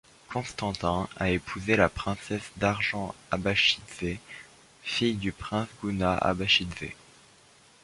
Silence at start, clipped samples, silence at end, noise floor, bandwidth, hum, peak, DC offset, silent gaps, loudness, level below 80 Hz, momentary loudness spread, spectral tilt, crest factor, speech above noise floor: 0.3 s; under 0.1%; 0.9 s; -58 dBFS; 11.5 kHz; none; -6 dBFS; under 0.1%; none; -28 LUFS; -48 dBFS; 14 LU; -4.5 dB/octave; 24 dB; 29 dB